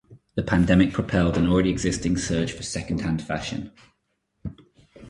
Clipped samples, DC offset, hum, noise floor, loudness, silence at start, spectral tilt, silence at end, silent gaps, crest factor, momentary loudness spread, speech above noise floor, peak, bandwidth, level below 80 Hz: under 0.1%; under 0.1%; none; -74 dBFS; -23 LUFS; 0.1 s; -6 dB/octave; 0 s; none; 20 dB; 20 LU; 51 dB; -4 dBFS; 11.5 kHz; -40 dBFS